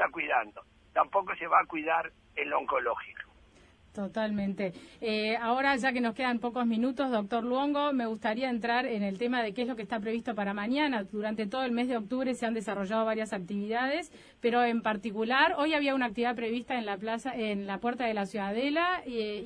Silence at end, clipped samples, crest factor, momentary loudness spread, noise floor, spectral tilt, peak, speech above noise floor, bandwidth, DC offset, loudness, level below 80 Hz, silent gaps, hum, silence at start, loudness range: 0 s; under 0.1%; 20 dB; 8 LU; -59 dBFS; -5.5 dB/octave; -10 dBFS; 29 dB; 10.5 kHz; under 0.1%; -31 LUFS; -66 dBFS; none; none; 0 s; 3 LU